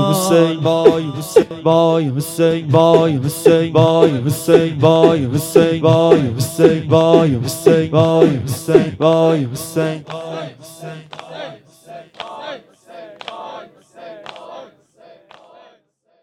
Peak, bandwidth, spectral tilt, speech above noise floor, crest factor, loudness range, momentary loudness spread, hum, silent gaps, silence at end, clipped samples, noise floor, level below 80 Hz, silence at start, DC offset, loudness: 0 dBFS; 17.5 kHz; -6.5 dB/octave; 45 dB; 16 dB; 20 LU; 21 LU; none; none; 1.6 s; 0.3%; -58 dBFS; -52 dBFS; 0 s; under 0.1%; -14 LUFS